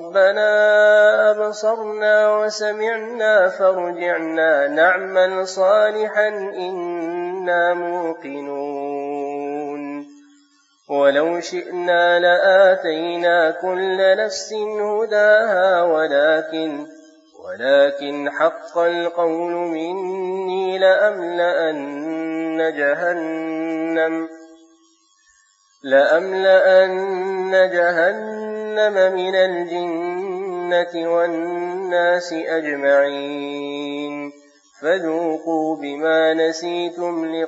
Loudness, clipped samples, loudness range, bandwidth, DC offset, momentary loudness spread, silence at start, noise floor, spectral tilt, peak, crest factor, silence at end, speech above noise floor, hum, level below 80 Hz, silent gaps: -18 LUFS; under 0.1%; 6 LU; 8 kHz; under 0.1%; 12 LU; 0 s; -58 dBFS; -4 dB/octave; -2 dBFS; 16 dB; 0 s; 40 dB; none; -80 dBFS; none